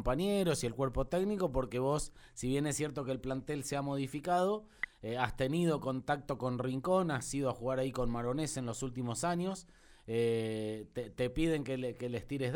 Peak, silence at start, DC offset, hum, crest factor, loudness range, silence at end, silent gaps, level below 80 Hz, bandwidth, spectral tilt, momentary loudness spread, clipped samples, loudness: -14 dBFS; 0 s; under 0.1%; none; 20 dB; 2 LU; 0 s; none; -50 dBFS; 19 kHz; -5.5 dB/octave; 7 LU; under 0.1%; -35 LUFS